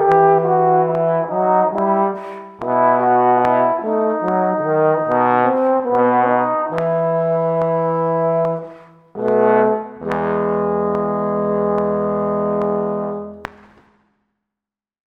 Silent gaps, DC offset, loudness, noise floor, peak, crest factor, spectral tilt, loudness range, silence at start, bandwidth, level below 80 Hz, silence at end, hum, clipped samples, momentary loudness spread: none; under 0.1%; -17 LUFS; -87 dBFS; -2 dBFS; 16 dB; -9.5 dB/octave; 4 LU; 0 s; 5.6 kHz; -56 dBFS; 1.6 s; none; under 0.1%; 10 LU